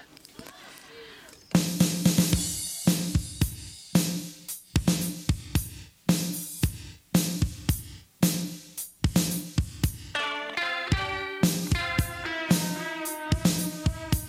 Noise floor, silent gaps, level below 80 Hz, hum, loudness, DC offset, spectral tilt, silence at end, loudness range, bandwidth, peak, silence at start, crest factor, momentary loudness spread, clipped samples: -49 dBFS; none; -40 dBFS; none; -28 LUFS; under 0.1%; -4.5 dB/octave; 0 s; 3 LU; 16.5 kHz; -6 dBFS; 0 s; 22 dB; 16 LU; under 0.1%